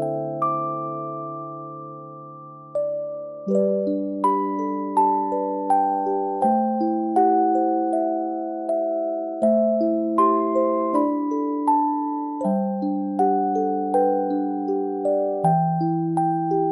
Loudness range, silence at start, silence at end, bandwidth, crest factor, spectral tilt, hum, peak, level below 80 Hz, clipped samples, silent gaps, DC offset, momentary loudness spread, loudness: 5 LU; 0 s; 0 s; 11.5 kHz; 14 dB; -10 dB/octave; none; -8 dBFS; -68 dBFS; under 0.1%; none; under 0.1%; 11 LU; -22 LUFS